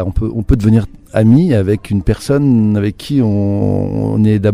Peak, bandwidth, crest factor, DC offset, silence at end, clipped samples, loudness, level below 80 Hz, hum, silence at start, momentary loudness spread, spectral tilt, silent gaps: 0 dBFS; 12.5 kHz; 12 dB; under 0.1%; 0 s; under 0.1%; -13 LUFS; -26 dBFS; none; 0 s; 6 LU; -8.5 dB/octave; none